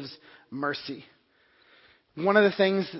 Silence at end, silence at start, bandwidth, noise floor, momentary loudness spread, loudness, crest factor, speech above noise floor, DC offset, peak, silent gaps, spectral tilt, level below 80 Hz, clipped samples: 0 s; 0 s; 5.8 kHz; -64 dBFS; 21 LU; -25 LUFS; 22 dB; 39 dB; under 0.1%; -6 dBFS; none; -9.5 dB/octave; -74 dBFS; under 0.1%